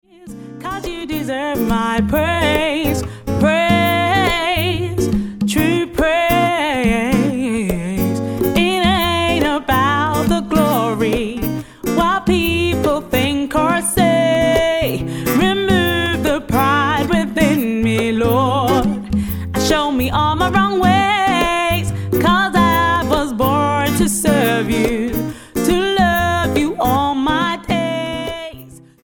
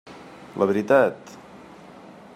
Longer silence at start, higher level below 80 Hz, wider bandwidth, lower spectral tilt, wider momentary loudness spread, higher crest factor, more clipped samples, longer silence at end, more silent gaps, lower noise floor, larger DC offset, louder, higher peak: first, 0.2 s vs 0.05 s; first, -32 dBFS vs -68 dBFS; first, 17.5 kHz vs 14.5 kHz; second, -5 dB/octave vs -6.5 dB/octave; second, 7 LU vs 26 LU; second, 14 dB vs 20 dB; neither; about the same, 0.25 s vs 0.25 s; neither; second, -38 dBFS vs -45 dBFS; neither; first, -16 LUFS vs -21 LUFS; about the same, -2 dBFS vs -4 dBFS